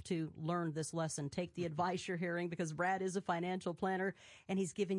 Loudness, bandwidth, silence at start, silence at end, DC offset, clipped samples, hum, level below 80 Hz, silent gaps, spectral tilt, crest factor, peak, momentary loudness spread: -39 LUFS; 11.5 kHz; 0 s; 0 s; under 0.1%; under 0.1%; none; -76 dBFS; none; -5.5 dB/octave; 16 dB; -24 dBFS; 4 LU